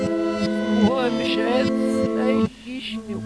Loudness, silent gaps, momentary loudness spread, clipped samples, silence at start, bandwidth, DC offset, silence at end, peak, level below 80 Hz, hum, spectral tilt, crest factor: -22 LUFS; none; 10 LU; under 0.1%; 0 s; 11 kHz; under 0.1%; 0 s; -6 dBFS; -52 dBFS; none; -6 dB/octave; 16 dB